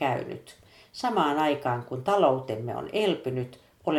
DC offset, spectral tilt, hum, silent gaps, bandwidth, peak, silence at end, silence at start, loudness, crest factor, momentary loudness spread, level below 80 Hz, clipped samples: under 0.1%; -6 dB/octave; none; none; 15.5 kHz; -8 dBFS; 0 s; 0 s; -27 LUFS; 18 dB; 15 LU; -66 dBFS; under 0.1%